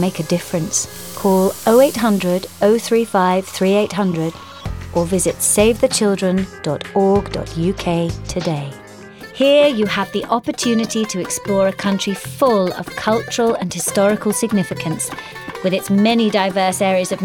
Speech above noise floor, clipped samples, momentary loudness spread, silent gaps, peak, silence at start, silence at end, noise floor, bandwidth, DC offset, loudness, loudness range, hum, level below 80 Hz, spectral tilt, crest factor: 20 dB; under 0.1%; 10 LU; none; 0 dBFS; 0 s; 0 s; -36 dBFS; 20 kHz; under 0.1%; -17 LUFS; 3 LU; none; -42 dBFS; -4.5 dB/octave; 16 dB